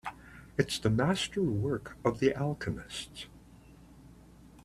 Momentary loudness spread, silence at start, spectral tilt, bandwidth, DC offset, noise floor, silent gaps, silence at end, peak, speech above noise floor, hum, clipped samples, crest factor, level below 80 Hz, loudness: 16 LU; 0.05 s; -5.5 dB/octave; 13.5 kHz; under 0.1%; -55 dBFS; none; 0.05 s; -10 dBFS; 24 dB; none; under 0.1%; 24 dB; -56 dBFS; -32 LUFS